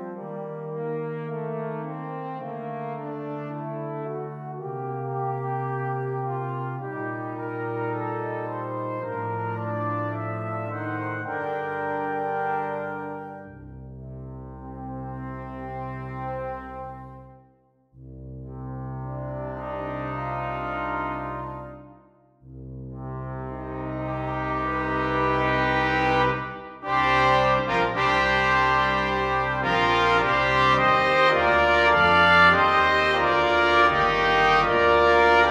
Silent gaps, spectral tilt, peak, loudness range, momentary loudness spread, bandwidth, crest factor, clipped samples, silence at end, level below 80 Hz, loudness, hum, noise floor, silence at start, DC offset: none; -6 dB/octave; -6 dBFS; 17 LU; 18 LU; 11.5 kHz; 20 dB; under 0.1%; 0 s; -44 dBFS; -23 LUFS; none; -61 dBFS; 0 s; under 0.1%